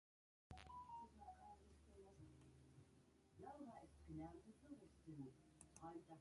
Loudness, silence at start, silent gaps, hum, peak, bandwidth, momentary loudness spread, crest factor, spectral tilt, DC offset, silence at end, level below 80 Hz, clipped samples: -62 LUFS; 0.5 s; none; none; -44 dBFS; 11 kHz; 10 LU; 18 dB; -6 dB/octave; under 0.1%; 0 s; -74 dBFS; under 0.1%